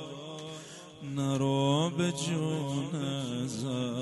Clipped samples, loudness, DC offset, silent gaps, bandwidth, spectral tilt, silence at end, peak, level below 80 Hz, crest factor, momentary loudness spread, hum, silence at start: under 0.1%; -32 LUFS; under 0.1%; none; 11.5 kHz; -5.5 dB/octave; 0 s; -16 dBFS; -68 dBFS; 16 dB; 14 LU; none; 0 s